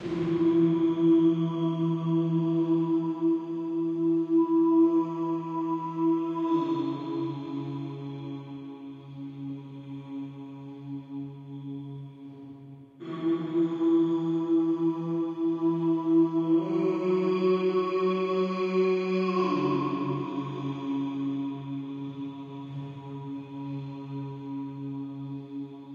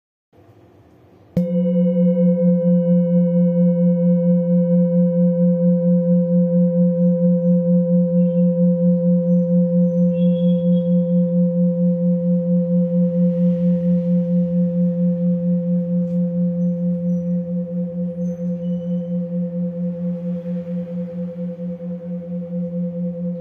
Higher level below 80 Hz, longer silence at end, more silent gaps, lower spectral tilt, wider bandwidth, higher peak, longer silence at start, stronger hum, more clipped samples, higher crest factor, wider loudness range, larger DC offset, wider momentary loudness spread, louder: second, -74 dBFS vs -64 dBFS; about the same, 0 s vs 0 s; neither; second, -9 dB/octave vs -13 dB/octave; first, 5.2 kHz vs 1.6 kHz; second, -14 dBFS vs -6 dBFS; second, 0 s vs 1.35 s; neither; neither; about the same, 14 dB vs 12 dB; first, 14 LU vs 8 LU; neither; first, 16 LU vs 9 LU; second, -28 LUFS vs -18 LUFS